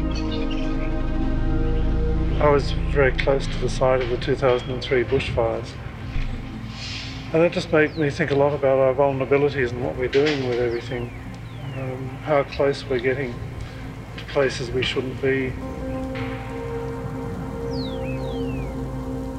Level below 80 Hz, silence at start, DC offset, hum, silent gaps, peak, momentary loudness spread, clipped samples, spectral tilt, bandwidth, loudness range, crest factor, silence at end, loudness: -30 dBFS; 0 s; under 0.1%; none; none; -4 dBFS; 12 LU; under 0.1%; -6.5 dB/octave; 10.5 kHz; 6 LU; 20 dB; 0 s; -24 LUFS